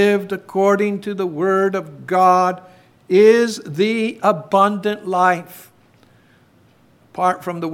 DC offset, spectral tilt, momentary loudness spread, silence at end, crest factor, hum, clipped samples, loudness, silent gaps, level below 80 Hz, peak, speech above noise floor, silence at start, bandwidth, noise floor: under 0.1%; -5.5 dB/octave; 11 LU; 0 s; 16 dB; none; under 0.1%; -17 LUFS; none; -70 dBFS; -2 dBFS; 36 dB; 0 s; 16.5 kHz; -53 dBFS